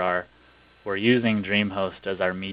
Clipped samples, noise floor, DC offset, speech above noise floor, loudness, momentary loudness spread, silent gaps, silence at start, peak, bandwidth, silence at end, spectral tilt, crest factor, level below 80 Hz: under 0.1%; -55 dBFS; under 0.1%; 31 dB; -24 LUFS; 9 LU; none; 0 s; -6 dBFS; 5.2 kHz; 0 s; -9 dB/octave; 20 dB; -60 dBFS